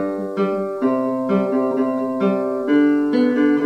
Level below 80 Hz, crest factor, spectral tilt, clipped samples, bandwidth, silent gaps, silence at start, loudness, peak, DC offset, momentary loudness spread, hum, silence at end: -78 dBFS; 14 dB; -8.5 dB/octave; under 0.1%; 6.2 kHz; none; 0 s; -19 LUFS; -4 dBFS; under 0.1%; 5 LU; none; 0 s